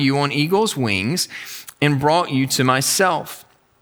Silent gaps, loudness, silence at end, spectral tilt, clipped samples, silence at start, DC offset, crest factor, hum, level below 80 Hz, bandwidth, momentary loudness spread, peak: none; -18 LUFS; 0.4 s; -4 dB/octave; under 0.1%; 0 s; under 0.1%; 18 dB; none; -62 dBFS; over 20 kHz; 13 LU; -2 dBFS